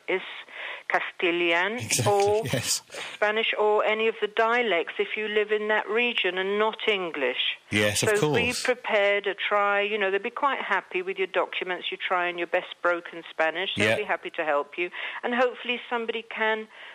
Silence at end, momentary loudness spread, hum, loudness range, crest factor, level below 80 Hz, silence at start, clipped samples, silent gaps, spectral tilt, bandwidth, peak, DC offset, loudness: 0 s; 7 LU; none; 3 LU; 20 dB; -68 dBFS; 0.1 s; under 0.1%; none; -3 dB/octave; 15 kHz; -6 dBFS; under 0.1%; -25 LUFS